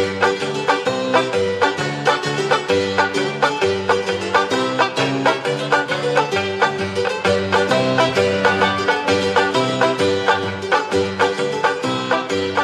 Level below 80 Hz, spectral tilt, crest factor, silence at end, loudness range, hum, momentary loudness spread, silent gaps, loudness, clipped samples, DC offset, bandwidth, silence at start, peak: -60 dBFS; -4 dB/octave; 16 dB; 0 s; 2 LU; none; 3 LU; none; -18 LUFS; under 0.1%; under 0.1%; 12.5 kHz; 0 s; -2 dBFS